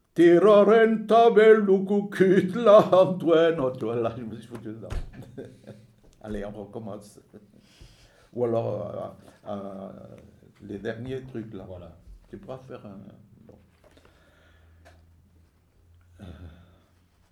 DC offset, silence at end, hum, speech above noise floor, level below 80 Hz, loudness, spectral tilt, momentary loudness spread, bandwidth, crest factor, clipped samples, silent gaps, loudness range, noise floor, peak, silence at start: under 0.1%; 0.8 s; none; 39 dB; -50 dBFS; -20 LUFS; -7.5 dB/octave; 27 LU; 12 kHz; 20 dB; under 0.1%; none; 23 LU; -62 dBFS; -4 dBFS; 0.15 s